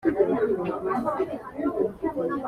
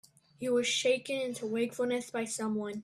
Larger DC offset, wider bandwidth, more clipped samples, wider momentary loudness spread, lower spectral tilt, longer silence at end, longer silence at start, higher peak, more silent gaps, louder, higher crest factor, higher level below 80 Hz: neither; second, 11.5 kHz vs 13.5 kHz; neither; about the same, 6 LU vs 7 LU; first, -8.5 dB/octave vs -3 dB/octave; about the same, 0 s vs 0 s; second, 0 s vs 0.4 s; first, -8 dBFS vs -16 dBFS; neither; first, -27 LUFS vs -32 LUFS; about the same, 18 dB vs 16 dB; first, -56 dBFS vs -76 dBFS